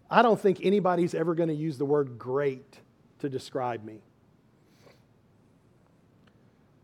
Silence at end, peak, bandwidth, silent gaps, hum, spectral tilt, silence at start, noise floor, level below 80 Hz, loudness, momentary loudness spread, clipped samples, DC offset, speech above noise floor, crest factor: 2.85 s; -6 dBFS; 12.5 kHz; none; none; -7 dB/octave; 0.1 s; -62 dBFS; -74 dBFS; -27 LUFS; 14 LU; under 0.1%; under 0.1%; 36 dB; 24 dB